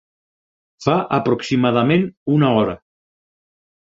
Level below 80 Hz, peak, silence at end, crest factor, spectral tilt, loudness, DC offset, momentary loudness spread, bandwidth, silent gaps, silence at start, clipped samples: -54 dBFS; 0 dBFS; 1.1 s; 20 dB; -7.5 dB/octave; -18 LUFS; under 0.1%; 7 LU; 7.8 kHz; 2.17-2.26 s; 0.8 s; under 0.1%